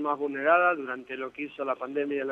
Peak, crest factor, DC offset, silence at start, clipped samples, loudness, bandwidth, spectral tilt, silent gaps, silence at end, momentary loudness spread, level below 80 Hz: -10 dBFS; 18 dB; under 0.1%; 0 s; under 0.1%; -28 LUFS; 4.2 kHz; -6.5 dB/octave; none; 0 s; 13 LU; -76 dBFS